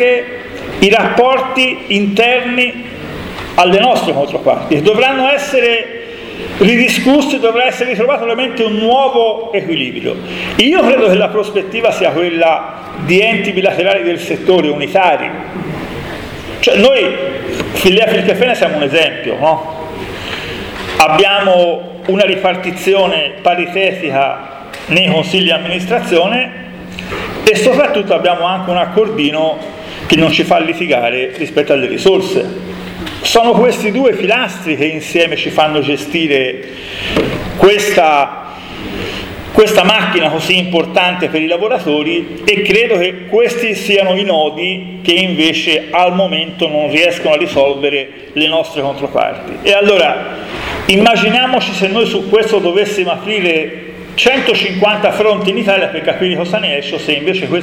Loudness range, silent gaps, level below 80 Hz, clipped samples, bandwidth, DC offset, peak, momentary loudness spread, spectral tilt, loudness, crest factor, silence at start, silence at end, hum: 2 LU; none; -42 dBFS; under 0.1%; 18.5 kHz; under 0.1%; 0 dBFS; 13 LU; -4.5 dB/octave; -12 LUFS; 12 dB; 0 s; 0 s; none